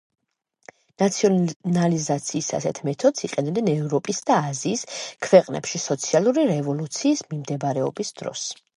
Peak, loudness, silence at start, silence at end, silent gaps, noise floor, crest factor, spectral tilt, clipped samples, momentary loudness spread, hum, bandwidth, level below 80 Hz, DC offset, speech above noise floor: -2 dBFS; -23 LUFS; 1 s; 0.2 s; 1.56-1.60 s; -66 dBFS; 22 dB; -5 dB/octave; under 0.1%; 10 LU; none; 11.5 kHz; -68 dBFS; under 0.1%; 44 dB